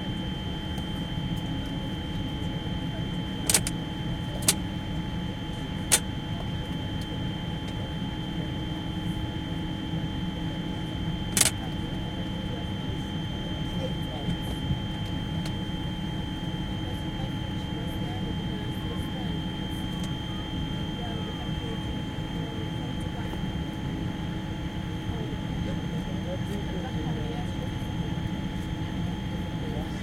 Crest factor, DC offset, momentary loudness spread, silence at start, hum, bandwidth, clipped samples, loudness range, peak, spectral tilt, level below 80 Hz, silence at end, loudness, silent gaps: 28 dB; under 0.1%; 7 LU; 0 s; none; 16.5 kHz; under 0.1%; 4 LU; -4 dBFS; -4.5 dB/octave; -40 dBFS; 0 s; -31 LUFS; none